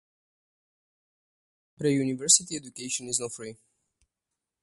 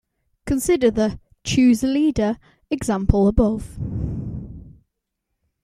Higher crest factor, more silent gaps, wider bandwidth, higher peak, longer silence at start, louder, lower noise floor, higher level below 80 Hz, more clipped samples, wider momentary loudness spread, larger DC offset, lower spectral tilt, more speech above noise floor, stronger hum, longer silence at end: first, 26 dB vs 18 dB; neither; second, 12 kHz vs 14.5 kHz; second, -6 dBFS vs -2 dBFS; first, 1.8 s vs 0.45 s; second, -25 LUFS vs -20 LUFS; first, -87 dBFS vs -78 dBFS; second, -72 dBFS vs -34 dBFS; neither; about the same, 17 LU vs 16 LU; neither; second, -2.5 dB/octave vs -6 dB/octave; about the same, 59 dB vs 60 dB; neither; first, 1.1 s vs 0.95 s